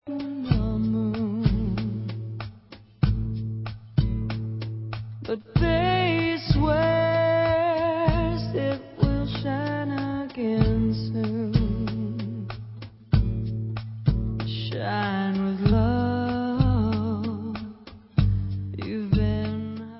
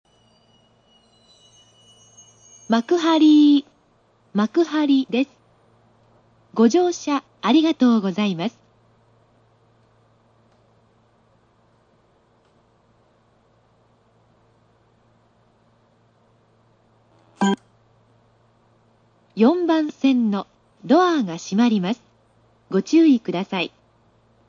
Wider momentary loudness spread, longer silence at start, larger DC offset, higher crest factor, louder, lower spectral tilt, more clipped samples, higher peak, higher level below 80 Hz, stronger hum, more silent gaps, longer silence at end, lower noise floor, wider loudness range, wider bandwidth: about the same, 11 LU vs 13 LU; second, 0.05 s vs 2.7 s; neither; about the same, 20 dB vs 18 dB; second, -26 LUFS vs -19 LUFS; first, -11.5 dB/octave vs -5.5 dB/octave; neither; about the same, -6 dBFS vs -4 dBFS; first, -34 dBFS vs -72 dBFS; neither; neither; second, 0 s vs 0.8 s; second, -48 dBFS vs -60 dBFS; second, 5 LU vs 12 LU; second, 5.8 kHz vs 7.6 kHz